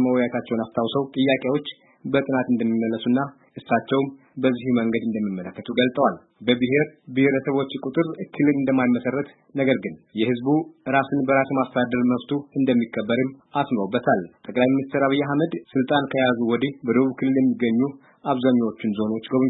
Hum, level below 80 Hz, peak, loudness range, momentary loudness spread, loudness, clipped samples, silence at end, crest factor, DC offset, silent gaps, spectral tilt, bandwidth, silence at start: none; -66 dBFS; -6 dBFS; 2 LU; 7 LU; -23 LUFS; under 0.1%; 0 s; 16 dB; under 0.1%; none; -11 dB/octave; 4.1 kHz; 0 s